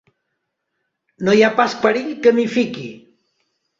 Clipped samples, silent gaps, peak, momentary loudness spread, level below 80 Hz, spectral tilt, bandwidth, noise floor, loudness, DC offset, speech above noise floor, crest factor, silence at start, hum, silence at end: under 0.1%; none; -2 dBFS; 11 LU; -62 dBFS; -5.5 dB/octave; 7.6 kHz; -75 dBFS; -17 LUFS; under 0.1%; 59 dB; 18 dB; 1.2 s; none; 0.8 s